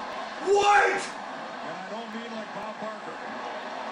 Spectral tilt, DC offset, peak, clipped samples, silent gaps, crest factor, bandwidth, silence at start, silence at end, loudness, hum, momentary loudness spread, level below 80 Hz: -2.5 dB/octave; under 0.1%; -10 dBFS; under 0.1%; none; 18 dB; 11 kHz; 0 s; 0 s; -28 LUFS; none; 16 LU; -68 dBFS